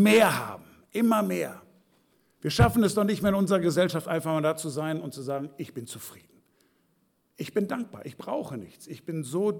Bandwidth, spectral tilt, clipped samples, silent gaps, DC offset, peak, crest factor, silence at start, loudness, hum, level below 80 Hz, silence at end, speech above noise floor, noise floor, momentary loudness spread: 19 kHz; -5.5 dB/octave; under 0.1%; none; under 0.1%; -12 dBFS; 16 dB; 0 s; -27 LUFS; none; -50 dBFS; 0 s; 44 dB; -70 dBFS; 18 LU